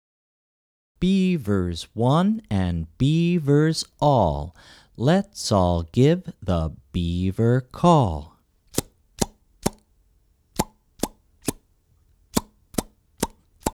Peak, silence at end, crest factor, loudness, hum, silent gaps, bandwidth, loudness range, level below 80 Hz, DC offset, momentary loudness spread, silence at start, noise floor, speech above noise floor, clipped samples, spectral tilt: -2 dBFS; 0.05 s; 22 dB; -23 LUFS; none; none; 17.5 kHz; 10 LU; -42 dBFS; under 0.1%; 12 LU; 1 s; -62 dBFS; 41 dB; under 0.1%; -6 dB/octave